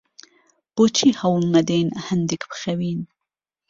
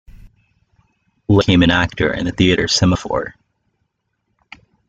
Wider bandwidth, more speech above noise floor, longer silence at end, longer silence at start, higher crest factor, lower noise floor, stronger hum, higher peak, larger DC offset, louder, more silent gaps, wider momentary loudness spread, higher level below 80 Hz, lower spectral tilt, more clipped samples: second, 7.6 kHz vs 9.2 kHz; first, 65 dB vs 56 dB; second, 0.65 s vs 1.55 s; first, 0.75 s vs 0.15 s; about the same, 18 dB vs 16 dB; first, -85 dBFS vs -71 dBFS; neither; about the same, -4 dBFS vs -2 dBFS; neither; second, -21 LUFS vs -15 LUFS; neither; about the same, 12 LU vs 11 LU; second, -60 dBFS vs -40 dBFS; about the same, -5 dB/octave vs -5 dB/octave; neither